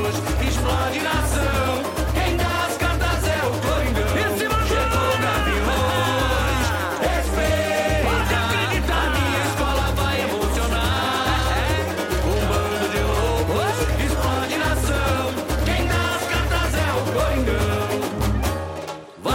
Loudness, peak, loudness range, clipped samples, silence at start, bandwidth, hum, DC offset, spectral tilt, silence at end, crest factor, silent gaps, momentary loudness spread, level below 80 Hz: -21 LUFS; -8 dBFS; 1 LU; under 0.1%; 0 s; 16.5 kHz; none; under 0.1%; -4.5 dB/octave; 0 s; 12 dB; none; 3 LU; -26 dBFS